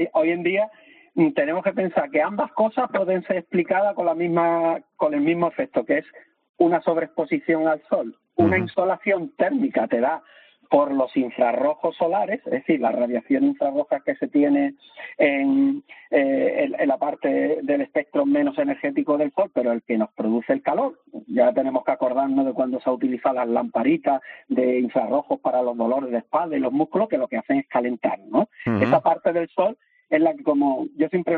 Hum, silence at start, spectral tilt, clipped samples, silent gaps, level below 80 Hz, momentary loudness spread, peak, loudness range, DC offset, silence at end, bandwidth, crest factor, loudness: none; 0 s; -5.5 dB/octave; under 0.1%; 6.49-6.54 s; -70 dBFS; 5 LU; -4 dBFS; 1 LU; under 0.1%; 0 s; 4.4 kHz; 18 dB; -22 LUFS